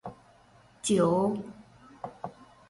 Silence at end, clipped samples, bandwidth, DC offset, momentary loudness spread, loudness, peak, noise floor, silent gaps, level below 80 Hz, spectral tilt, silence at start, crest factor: 0.25 s; under 0.1%; 11.5 kHz; under 0.1%; 21 LU; -28 LUFS; -14 dBFS; -59 dBFS; none; -64 dBFS; -5.5 dB/octave; 0.05 s; 18 dB